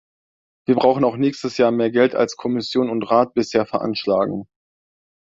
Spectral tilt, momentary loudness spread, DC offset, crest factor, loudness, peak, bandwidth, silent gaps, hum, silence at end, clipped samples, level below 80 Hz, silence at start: -6 dB/octave; 6 LU; under 0.1%; 18 dB; -19 LUFS; -2 dBFS; 7.8 kHz; none; none; 0.95 s; under 0.1%; -60 dBFS; 0.7 s